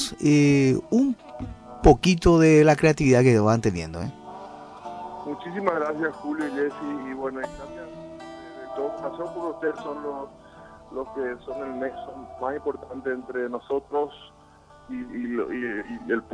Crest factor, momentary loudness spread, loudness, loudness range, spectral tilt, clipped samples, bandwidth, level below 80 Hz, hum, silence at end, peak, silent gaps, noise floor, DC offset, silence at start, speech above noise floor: 22 dB; 21 LU; -24 LUFS; 14 LU; -6.5 dB/octave; under 0.1%; 11 kHz; -40 dBFS; none; 0 s; -4 dBFS; none; -52 dBFS; under 0.1%; 0 s; 28 dB